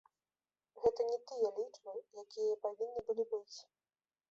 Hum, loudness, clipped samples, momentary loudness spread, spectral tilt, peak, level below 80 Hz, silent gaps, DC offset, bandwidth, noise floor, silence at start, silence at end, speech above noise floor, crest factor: none; -39 LUFS; under 0.1%; 13 LU; -4 dB/octave; -20 dBFS; -76 dBFS; none; under 0.1%; 7.6 kHz; under -90 dBFS; 0.75 s; 0.7 s; over 51 dB; 20 dB